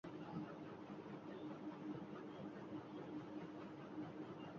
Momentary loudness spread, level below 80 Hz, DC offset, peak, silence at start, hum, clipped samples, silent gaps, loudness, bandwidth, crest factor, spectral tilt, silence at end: 3 LU; -82 dBFS; under 0.1%; -36 dBFS; 0.05 s; none; under 0.1%; none; -52 LUFS; 7.2 kHz; 16 dB; -6.5 dB/octave; 0 s